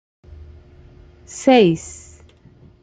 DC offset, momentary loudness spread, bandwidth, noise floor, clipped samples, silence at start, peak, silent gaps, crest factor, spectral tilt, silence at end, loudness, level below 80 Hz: under 0.1%; 24 LU; 9.4 kHz; -48 dBFS; under 0.1%; 1.35 s; -2 dBFS; none; 20 dB; -5.5 dB/octave; 0.9 s; -16 LUFS; -48 dBFS